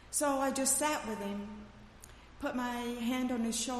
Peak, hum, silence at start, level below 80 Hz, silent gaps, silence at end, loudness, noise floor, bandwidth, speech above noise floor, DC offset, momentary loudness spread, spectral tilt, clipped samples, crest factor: -18 dBFS; none; 0 s; -58 dBFS; none; 0 s; -34 LUFS; -54 dBFS; 15 kHz; 20 dB; under 0.1%; 25 LU; -2.5 dB/octave; under 0.1%; 18 dB